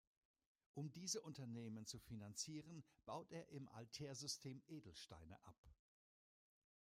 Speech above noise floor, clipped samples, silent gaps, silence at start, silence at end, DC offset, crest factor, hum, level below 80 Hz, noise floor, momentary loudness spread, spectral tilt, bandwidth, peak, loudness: over 36 dB; under 0.1%; 5.58-5.63 s; 0.75 s; 1.15 s; under 0.1%; 22 dB; none; -80 dBFS; under -90 dBFS; 12 LU; -4 dB/octave; 16 kHz; -34 dBFS; -53 LUFS